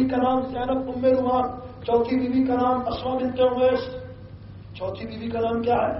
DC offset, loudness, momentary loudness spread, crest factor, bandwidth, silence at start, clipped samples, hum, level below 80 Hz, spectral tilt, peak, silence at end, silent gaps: under 0.1%; -24 LUFS; 15 LU; 14 dB; 5.8 kHz; 0 s; under 0.1%; none; -48 dBFS; -5.5 dB/octave; -8 dBFS; 0 s; none